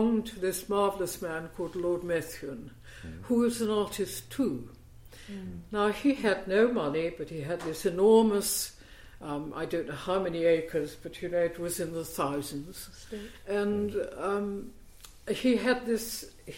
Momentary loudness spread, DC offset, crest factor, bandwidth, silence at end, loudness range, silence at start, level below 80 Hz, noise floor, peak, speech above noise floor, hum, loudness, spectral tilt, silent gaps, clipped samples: 16 LU; under 0.1%; 20 dB; 16.5 kHz; 0 s; 6 LU; 0 s; -54 dBFS; -50 dBFS; -10 dBFS; 20 dB; none; -30 LUFS; -4.5 dB/octave; none; under 0.1%